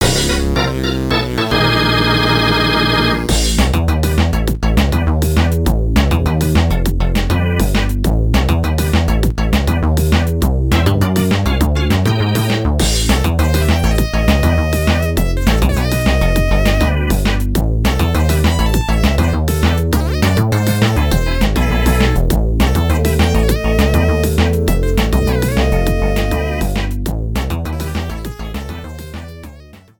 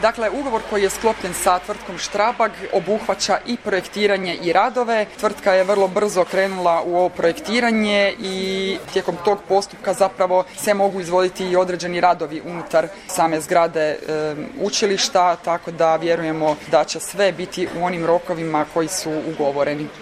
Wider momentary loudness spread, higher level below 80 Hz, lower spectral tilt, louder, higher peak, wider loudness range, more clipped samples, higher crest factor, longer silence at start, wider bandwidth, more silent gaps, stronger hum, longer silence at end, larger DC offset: about the same, 5 LU vs 6 LU; first, -18 dBFS vs -52 dBFS; first, -5.5 dB/octave vs -3.5 dB/octave; first, -15 LUFS vs -20 LUFS; about the same, 0 dBFS vs -2 dBFS; about the same, 2 LU vs 2 LU; neither; about the same, 14 dB vs 18 dB; about the same, 0 s vs 0 s; first, 19.5 kHz vs 15.5 kHz; neither; neither; first, 0.25 s vs 0 s; neither